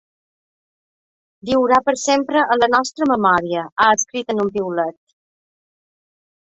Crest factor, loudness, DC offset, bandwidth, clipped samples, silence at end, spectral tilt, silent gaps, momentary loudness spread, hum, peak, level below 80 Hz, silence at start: 18 dB; -17 LUFS; under 0.1%; 8.2 kHz; under 0.1%; 1.55 s; -3 dB/octave; 3.72-3.76 s; 8 LU; none; -2 dBFS; -58 dBFS; 1.45 s